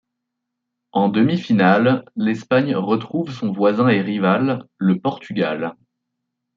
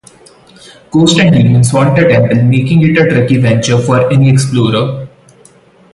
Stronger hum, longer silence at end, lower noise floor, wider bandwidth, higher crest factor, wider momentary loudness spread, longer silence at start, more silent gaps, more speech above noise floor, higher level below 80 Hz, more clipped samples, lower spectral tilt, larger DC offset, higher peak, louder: neither; about the same, 0.85 s vs 0.85 s; first, -79 dBFS vs -43 dBFS; second, 7.2 kHz vs 11.5 kHz; first, 16 dB vs 10 dB; first, 9 LU vs 5 LU; about the same, 0.95 s vs 0.95 s; neither; first, 61 dB vs 35 dB; second, -66 dBFS vs -40 dBFS; neither; first, -8 dB/octave vs -6 dB/octave; neither; about the same, -2 dBFS vs 0 dBFS; second, -19 LUFS vs -9 LUFS